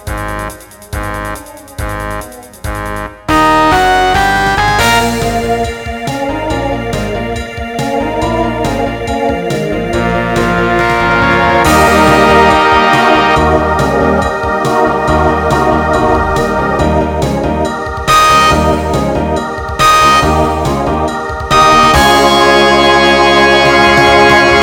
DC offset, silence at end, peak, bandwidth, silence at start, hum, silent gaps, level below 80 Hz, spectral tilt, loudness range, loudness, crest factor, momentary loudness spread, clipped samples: under 0.1%; 0 s; 0 dBFS; 19 kHz; 0 s; none; none; -24 dBFS; -4.5 dB/octave; 8 LU; -10 LUFS; 10 dB; 13 LU; 0.3%